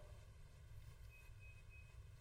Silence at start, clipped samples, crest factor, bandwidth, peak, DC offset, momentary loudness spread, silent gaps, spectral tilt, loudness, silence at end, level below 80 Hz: 0 s; under 0.1%; 14 dB; 16 kHz; -46 dBFS; under 0.1%; 2 LU; none; -5 dB/octave; -62 LUFS; 0 s; -62 dBFS